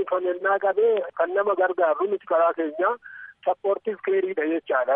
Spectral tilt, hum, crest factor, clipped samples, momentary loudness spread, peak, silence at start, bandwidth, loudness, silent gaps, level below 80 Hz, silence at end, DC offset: -8.5 dB/octave; none; 14 dB; under 0.1%; 5 LU; -10 dBFS; 0 s; 3.7 kHz; -24 LUFS; none; -78 dBFS; 0 s; under 0.1%